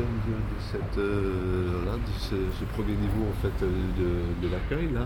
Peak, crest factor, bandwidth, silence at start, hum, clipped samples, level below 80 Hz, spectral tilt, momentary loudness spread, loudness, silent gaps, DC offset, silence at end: -14 dBFS; 14 dB; 18 kHz; 0 s; none; under 0.1%; -34 dBFS; -8 dB/octave; 4 LU; -30 LUFS; none; under 0.1%; 0 s